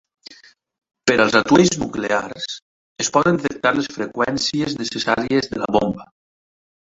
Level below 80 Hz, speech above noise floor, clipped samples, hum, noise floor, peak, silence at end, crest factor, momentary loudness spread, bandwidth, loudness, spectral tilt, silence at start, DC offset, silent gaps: -52 dBFS; 30 dB; under 0.1%; none; -49 dBFS; 0 dBFS; 0.8 s; 20 dB; 11 LU; 8 kHz; -19 LUFS; -4 dB/octave; 0.3 s; under 0.1%; 2.62-2.96 s